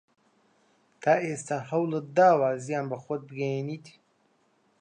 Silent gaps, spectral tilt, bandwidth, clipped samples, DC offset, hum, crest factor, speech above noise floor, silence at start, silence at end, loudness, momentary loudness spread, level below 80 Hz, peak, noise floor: none; -6.5 dB/octave; 10 kHz; under 0.1%; under 0.1%; none; 20 dB; 42 dB; 1 s; 0.9 s; -27 LUFS; 13 LU; -80 dBFS; -10 dBFS; -68 dBFS